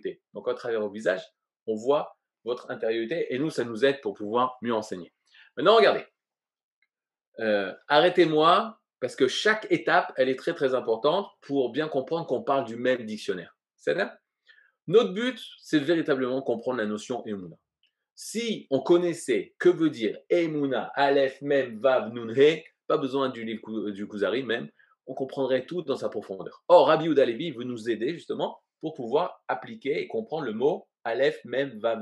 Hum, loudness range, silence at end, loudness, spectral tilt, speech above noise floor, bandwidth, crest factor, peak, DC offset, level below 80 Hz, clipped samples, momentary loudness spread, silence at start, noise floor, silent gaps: none; 6 LU; 0 s; -26 LUFS; -5 dB/octave; over 64 dB; 12 kHz; 20 dB; -6 dBFS; under 0.1%; -86 dBFS; under 0.1%; 13 LU; 0.05 s; under -90 dBFS; 1.62-1.66 s, 6.63-6.82 s, 7.27-7.32 s, 18.11-18.16 s